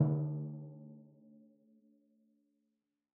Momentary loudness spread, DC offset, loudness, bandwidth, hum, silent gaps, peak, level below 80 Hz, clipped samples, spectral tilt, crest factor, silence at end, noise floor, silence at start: 27 LU; under 0.1%; -39 LUFS; 1.6 kHz; none; none; -18 dBFS; -82 dBFS; under 0.1%; -13 dB/octave; 22 dB; 2.15 s; -86 dBFS; 0 s